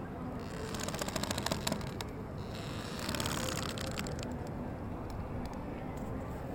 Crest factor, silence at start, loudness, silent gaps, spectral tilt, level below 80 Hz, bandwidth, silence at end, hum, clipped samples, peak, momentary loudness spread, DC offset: 24 dB; 0 s; -38 LUFS; none; -4.5 dB/octave; -50 dBFS; 17 kHz; 0 s; none; under 0.1%; -14 dBFS; 7 LU; under 0.1%